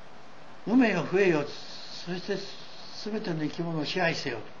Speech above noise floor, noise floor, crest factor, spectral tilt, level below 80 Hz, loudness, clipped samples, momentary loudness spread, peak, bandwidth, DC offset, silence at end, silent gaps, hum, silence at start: 22 dB; -50 dBFS; 20 dB; -5.5 dB/octave; -68 dBFS; -29 LUFS; under 0.1%; 16 LU; -10 dBFS; 7.4 kHz; 0.9%; 0 s; none; none; 0 s